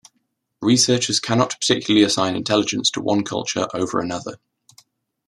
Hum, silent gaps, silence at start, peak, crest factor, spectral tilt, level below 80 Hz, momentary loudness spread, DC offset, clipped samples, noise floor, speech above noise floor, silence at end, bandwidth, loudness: none; none; 0.6 s; -2 dBFS; 18 dB; -3.5 dB/octave; -60 dBFS; 9 LU; under 0.1%; under 0.1%; -71 dBFS; 52 dB; 0.9 s; 13 kHz; -19 LUFS